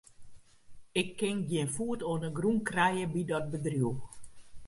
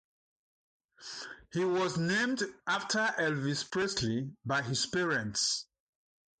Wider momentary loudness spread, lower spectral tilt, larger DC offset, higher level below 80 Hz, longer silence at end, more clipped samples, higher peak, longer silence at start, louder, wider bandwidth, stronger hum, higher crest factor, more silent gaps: second, 6 LU vs 10 LU; first, -5.5 dB/octave vs -3.5 dB/octave; neither; first, -60 dBFS vs -66 dBFS; second, 0 s vs 0.75 s; neither; first, -14 dBFS vs -18 dBFS; second, 0.2 s vs 1 s; about the same, -32 LUFS vs -32 LUFS; first, 11.5 kHz vs 9.6 kHz; neither; about the same, 20 dB vs 16 dB; neither